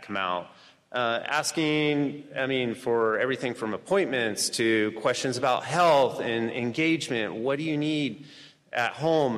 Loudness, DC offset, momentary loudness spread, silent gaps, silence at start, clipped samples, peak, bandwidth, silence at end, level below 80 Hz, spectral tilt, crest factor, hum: -26 LUFS; under 0.1%; 7 LU; none; 0 s; under 0.1%; -12 dBFS; 14.5 kHz; 0 s; -70 dBFS; -4 dB/octave; 14 dB; none